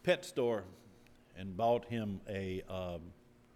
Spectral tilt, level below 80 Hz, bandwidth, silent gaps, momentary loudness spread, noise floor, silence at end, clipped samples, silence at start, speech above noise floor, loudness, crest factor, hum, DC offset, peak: -6 dB/octave; -64 dBFS; 17 kHz; none; 17 LU; -61 dBFS; 0.45 s; under 0.1%; 0.05 s; 25 dB; -37 LUFS; 20 dB; none; under 0.1%; -18 dBFS